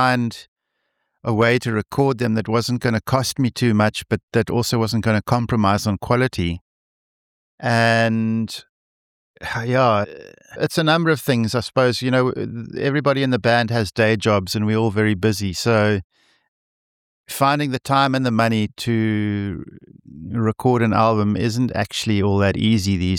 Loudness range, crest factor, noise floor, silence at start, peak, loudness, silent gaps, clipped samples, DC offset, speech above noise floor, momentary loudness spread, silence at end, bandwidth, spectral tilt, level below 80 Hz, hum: 2 LU; 16 dB; -74 dBFS; 0 s; -2 dBFS; -19 LUFS; 0.48-0.56 s, 4.23-4.28 s, 6.61-7.58 s, 8.69-9.34 s, 16.04-16.10 s, 16.48-17.24 s; under 0.1%; under 0.1%; 55 dB; 9 LU; 0 s; 17 kHz; -6 dB/octave; -48 dBFS; none